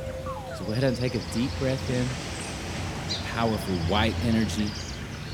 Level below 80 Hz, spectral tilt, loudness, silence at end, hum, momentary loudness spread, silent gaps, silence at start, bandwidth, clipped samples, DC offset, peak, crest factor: -42 dBFS; -5.5 dB/octave; -28 LUFS; 0 s; none; 10 LU; none; 0 s; 18 kHz; under 0.1%; under 0.1%; -8 dBFS; 20 dB